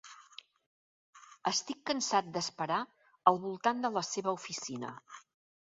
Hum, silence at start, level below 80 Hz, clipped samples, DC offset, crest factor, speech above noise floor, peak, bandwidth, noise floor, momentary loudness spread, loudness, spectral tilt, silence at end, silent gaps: none; 0.05 s; -82 dBFS; under 0.1%; under 0.1%; 28 dB; 23 dB; -8 dBFS; 7.6 kHz; -56 dBFS; 22 LU; -33 LUFS; -2.5 dB/octave; 0.5 s; 0.66-1.13 s